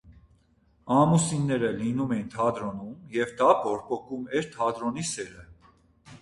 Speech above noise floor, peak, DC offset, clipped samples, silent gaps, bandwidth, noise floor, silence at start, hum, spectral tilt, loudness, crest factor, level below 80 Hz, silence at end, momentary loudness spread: 38 dB; -8 dBFS; under 0.1%; under 0.1%; none; 11.5 kHz; -64 dBFS; 0.05 s; none; -5.5 dB/octave; -27 LUFS; 20 dB; -58 dBFS; 0.05 s; 12 LU